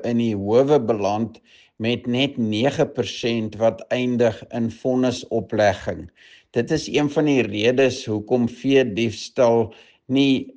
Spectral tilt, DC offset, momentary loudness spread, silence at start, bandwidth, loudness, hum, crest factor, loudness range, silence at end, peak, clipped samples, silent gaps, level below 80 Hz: -6 dB/octave; under 0.1%; 8 LU; 0 s; 9.2 kHz; -21 LUFS; none; 16 dB; 3 LU; 0.05 s; -4 dBFS; under 0.1%; none; -56 dBFS